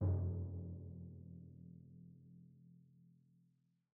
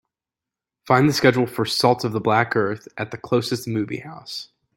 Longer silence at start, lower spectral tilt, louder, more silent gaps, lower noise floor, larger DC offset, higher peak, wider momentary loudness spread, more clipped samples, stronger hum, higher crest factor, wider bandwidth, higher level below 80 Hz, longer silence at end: second, 0 s vs 0.85 s; first, -13 dB/octave vs -5.5 dB/octave; second, -47 LUFS vs -21 LUFS; neither; second, -78 dBFS vs -88 dBFS; neither; second, -28 dBFS vs -2 dBFS; first, 24 LU vs 15 LU; neither; neither; about the same, 18 dB vs 20 dB; second, 1.7 kHz vs 17 kHz; about the same, -64 dBFS vs -60 dBFS; first, 0.85 s vs 0.35 s